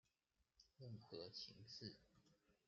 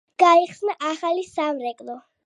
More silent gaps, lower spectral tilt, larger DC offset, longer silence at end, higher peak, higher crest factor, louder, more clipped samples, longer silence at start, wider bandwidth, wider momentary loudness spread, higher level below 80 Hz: neither; first, -4.5 dB/octave vs -3 dB/octave; neither; about the same, 0.15 s vs 0.25 s; second, -38 dBFS vs -2 dBFS; about the same, 22 dB vs 20 dB; second, -57 LUFS vs -21 LUFS; neither; first, 0.55 s vs 0.2 s; second, 7.2 kHz vs 11 kHz; second, 8 LU vs 17 LU; second, -86 dBFS vs -74 dBFS